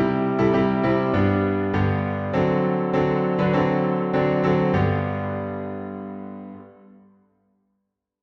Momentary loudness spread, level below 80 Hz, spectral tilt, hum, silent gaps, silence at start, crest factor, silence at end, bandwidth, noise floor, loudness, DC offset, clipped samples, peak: 13 LU; -48 dBFS; -9 dB/octave; none; none; 0 s; 14 dB; 1.5 s; 6.2 kHz; -77 dBFS; -22 LUFS; under 0.1%; under 0.1%; -8 dBFS